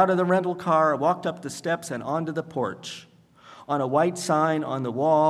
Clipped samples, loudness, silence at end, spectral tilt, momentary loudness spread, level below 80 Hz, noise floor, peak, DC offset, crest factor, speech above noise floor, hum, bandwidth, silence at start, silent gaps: under 0.1%; -25 LUFS; 0 s; -6 dB/octave; 10 LU; -72 dBFS; -51 dBFS; -6 dBFS; under 0.1%; 18 dB; 27 dB; none; 13.5 kHz; 0 s; none